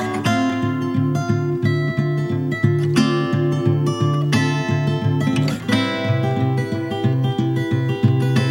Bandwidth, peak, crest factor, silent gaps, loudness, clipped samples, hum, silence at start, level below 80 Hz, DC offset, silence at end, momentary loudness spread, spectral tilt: 15.5 kHz; -4 dBFS; 16 dB; none; -19 LUFS; under 0.1%; none; 0 s; -54 dBFS; under 0.1%; 0 s; 3 LU; -7 dB/octave